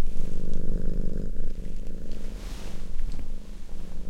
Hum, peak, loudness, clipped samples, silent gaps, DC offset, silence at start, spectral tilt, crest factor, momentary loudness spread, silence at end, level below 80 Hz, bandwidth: none; -10 dBFS; -37 LUFS; under 0.1%; none; under 0.1%; 0 s; -7 dB/octave; 12 dB; 9 LU; 0 s; -28 dBFS; 2.9 kHz